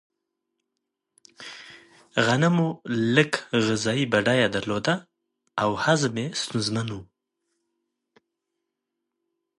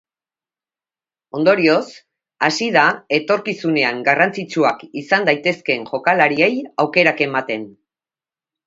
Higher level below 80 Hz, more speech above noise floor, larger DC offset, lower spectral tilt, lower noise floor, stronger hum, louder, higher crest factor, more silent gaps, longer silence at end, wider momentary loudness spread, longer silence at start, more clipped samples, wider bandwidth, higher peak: about the same, -62 dBFS vs -66 dBFS; second, 59 dB vs over 73 dB; neither; about the same, -5 dB/octave vs -5 dB/octave; second, -82 dBFS vs under -90 dBFS; neither; second, -24 LUFS vs -17 LUFS; about the same, 22 dB vs 18 dB; neither; first, 2.55 s vs 0.95 s; first, 17 LU vs 7 LU; about the same, 1.4 s vs 1.35 s; neither; first, 11.5 kHz vs 7.8 kHz; second, -4 dBFS vs 0 dBFS